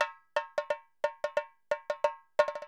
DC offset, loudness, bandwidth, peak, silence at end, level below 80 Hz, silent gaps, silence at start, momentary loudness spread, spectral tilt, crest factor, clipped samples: under 0.1%; -34 LUFS; 10.5 kHz; -10 dBFS; 0 s; -76 dBFS; none; 0 s; 6 LU; -1.5 dB/octave; 22 dB; under 0.1%